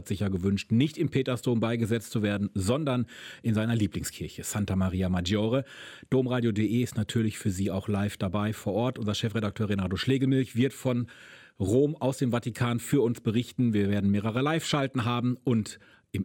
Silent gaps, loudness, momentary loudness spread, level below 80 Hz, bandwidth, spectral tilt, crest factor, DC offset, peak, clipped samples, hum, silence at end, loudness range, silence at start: none; -28 LUFS; 5 LU; -56 dBFS; 17 kHz; -6.5 dB/octave; 16 dB; under 0.1%; -12 dBFS; under 0.1%; none; 0 s; 2 LU; 0 s